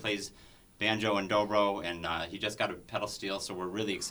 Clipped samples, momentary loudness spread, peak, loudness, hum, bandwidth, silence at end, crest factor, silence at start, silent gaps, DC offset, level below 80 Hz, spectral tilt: under 0.1%; 8 LU; -12 dBFS; -32 LUFS; none; over 20 kHz; 0 s; 20 dB; 0 s; none; under 0.1%; -62 dBFS; -3.5 dB/octave